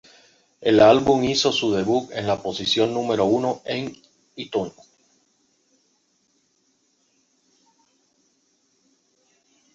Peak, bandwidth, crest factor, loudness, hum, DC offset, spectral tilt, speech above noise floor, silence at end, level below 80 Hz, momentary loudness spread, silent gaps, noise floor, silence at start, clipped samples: -2 dBFS; 7.8 kHz; 22 dB; -20 LUFS; none; under 0.1%; -4.5 dB/octave; 47 dB; 5.05 s; -56 dBFS; 14 LU; none; -67 dBFS; 0.6 s; under 0.1%